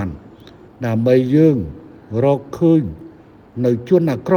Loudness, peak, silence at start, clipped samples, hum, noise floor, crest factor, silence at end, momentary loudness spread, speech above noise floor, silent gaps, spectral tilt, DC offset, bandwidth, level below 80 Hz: -16 LUFS; 0 dBFS; 0 s; under 0.1%; none; -42 dBFS; 16 dB; 0 s; 16 LU; 27 dB; none; -9.5 dB/octave; under 0.1%; 14.5 kHz; -48 dBFS